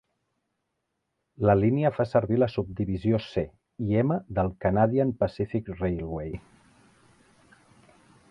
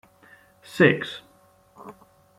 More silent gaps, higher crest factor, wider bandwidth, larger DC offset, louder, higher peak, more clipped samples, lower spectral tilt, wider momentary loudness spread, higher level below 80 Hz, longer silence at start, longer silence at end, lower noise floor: neither; second, 20 dB vs 26 dB; second, 6.2 kHz vs 15.5 kHz; neither; second, -26 LUFS vs -21 LUFS; second, -6 dBFS vs -2 dBFS; neither; first, -9.5 dB/octave vs -6.5 dB/octave; second, 11 LU vs 27 LU; first, -48 dBFS vs -68 dBFS; first, 1.4 s vs 0.75 s; first, 1.9 s vs 0.5 s; first, -80 dBFS vs -58 dBFS